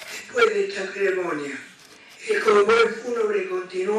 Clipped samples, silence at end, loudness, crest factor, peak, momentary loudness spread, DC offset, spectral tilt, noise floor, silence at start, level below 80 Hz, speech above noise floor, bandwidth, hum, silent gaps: under 0.1%; 0 s; -22 LUFS; 20 dB; -4 dBFS; 12 LU; under 0.1%; -3.5 dB/octave; -48 dBFS; 0 s; -68 dBFS; 26 dB; 13 kHz; none; none